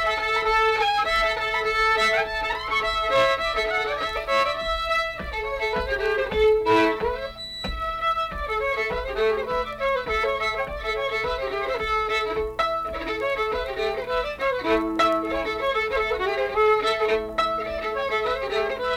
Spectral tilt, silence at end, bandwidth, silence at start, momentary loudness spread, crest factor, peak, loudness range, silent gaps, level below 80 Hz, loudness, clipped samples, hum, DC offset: -4 dB/octave; 0 s; 16 kHz; 0 s; 7 LU; 14 dB; -10 dBFS; 4 LU; none; -42 dBFS; -24 LUFS; under 0.1%; none; under 0.1%